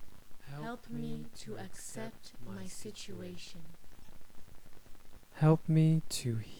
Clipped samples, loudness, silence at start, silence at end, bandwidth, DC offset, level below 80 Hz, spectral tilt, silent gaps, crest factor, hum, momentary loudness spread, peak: under 0.1%; -35 LUFS; 0 s; 0 s; 17 kHz; under 0.1%; -56 dBFS; -6.5 dB/octave; none; 18 dB; none; 21 LU; -16 dBFS